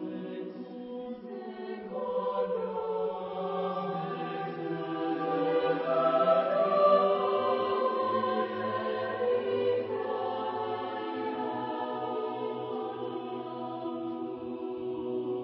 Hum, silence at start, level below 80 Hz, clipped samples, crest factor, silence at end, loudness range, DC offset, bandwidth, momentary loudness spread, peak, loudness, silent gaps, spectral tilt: none; 0 s; -74 dBFS; under 0.1%; 18 dB; 0 s; 8 LU; under 0.1%; 5.6 kHz; 13 LU; -12 dBFS; -31 LUFS; none; -4 dB/octave